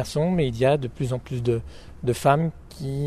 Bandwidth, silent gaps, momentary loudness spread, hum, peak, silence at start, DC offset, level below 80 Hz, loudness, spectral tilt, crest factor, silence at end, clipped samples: 14.5 kHz; none; 10 LU; none; -6 dBFS; 0 s; under 0.1%; -44 dBFS; -24 LUFS; -7 dB/octave; 18 dB; 0 s; under 0.1%